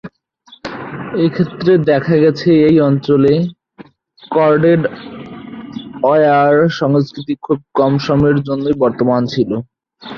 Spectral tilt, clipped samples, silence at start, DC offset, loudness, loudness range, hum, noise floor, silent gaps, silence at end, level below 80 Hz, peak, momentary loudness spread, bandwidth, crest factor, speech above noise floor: -8.5 dB/octave; under 0.1%; 0.05 s; under 0.1%; -13 LUFS; 3 LU; none; -46 dBFS; none; 0 s; -48 dBFS; -2 dBFS; 18 LU; 6.8 kHz; 12 dB; 34 dB